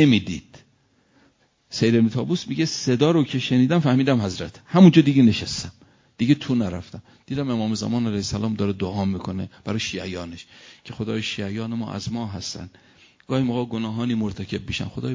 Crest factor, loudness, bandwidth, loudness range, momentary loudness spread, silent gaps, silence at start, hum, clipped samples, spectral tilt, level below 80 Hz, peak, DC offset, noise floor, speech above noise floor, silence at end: 20 dB; -22 LUFS; 7.6 kHz; 11 LU; 15 LU; none; 0 s; none; under 0.1%; -6 dB/octave; -48 dBFS; -2 dBFS; under 0.1%; -62 dBFS; 40 dB; 0 s